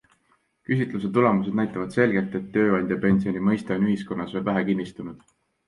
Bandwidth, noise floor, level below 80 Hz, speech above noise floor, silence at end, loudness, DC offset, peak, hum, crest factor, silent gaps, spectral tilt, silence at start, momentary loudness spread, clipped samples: 10.5 kHz; -67 dBFS; -56 dBFS; 44 dB; 0.5 s; -24 LUFS; under 0.1%; -4 dBFS; none; 20 dB; none; -8.5 dB/octave; 0.7 s; 7 LU; under 0.1%